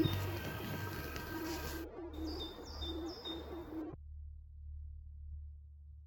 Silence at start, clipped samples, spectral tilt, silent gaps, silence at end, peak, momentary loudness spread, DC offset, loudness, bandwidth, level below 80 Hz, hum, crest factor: 0 s; under 0.1%; -5.5 dB/octave; none; 0 s; -20 dBFS; 11 LU; under 0.1%; -44 LUFS; 17.5 kHz; -50 dBFS; none; 24 dB